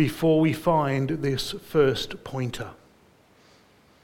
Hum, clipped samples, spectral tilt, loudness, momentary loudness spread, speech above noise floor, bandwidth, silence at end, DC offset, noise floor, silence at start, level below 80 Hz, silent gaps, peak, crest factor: none; under 0.1%; -6.5 dB/octave; -25 LUFS; 11 LU; 34 dB; 17 kHz; 1.3 s; under 0.1%; -58 dBFS; 0 s; -52 dBFS; none; -8 dBFS; 16 dB